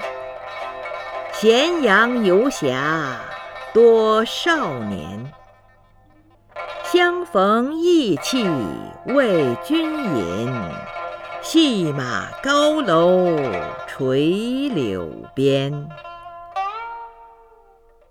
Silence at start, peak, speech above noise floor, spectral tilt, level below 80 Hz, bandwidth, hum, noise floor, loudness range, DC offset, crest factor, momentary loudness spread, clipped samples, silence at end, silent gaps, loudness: 0 s; -2 dBFS; 34 dB; -5 dB/octave; -54 dBFS; 17 kHz; none; -52 dBFS; 6 LU; under 0.1%; 18 dB; 17 LU; under 0.1%; 0.85 s; none; -19 LUFS